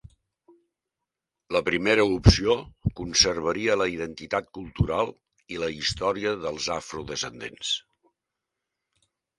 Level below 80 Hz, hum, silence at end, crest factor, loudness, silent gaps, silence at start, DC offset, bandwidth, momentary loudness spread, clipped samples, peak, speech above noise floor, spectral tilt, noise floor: -40 dBFS; none; 1.6 s; 26 dB; -25 LUFS; none; 1.5 s; under 0.1%; 11.5 kHz; 13 LU; under 0.1%; 0 dBFS; 61 dB; -4 dB/octave; -86 dBFS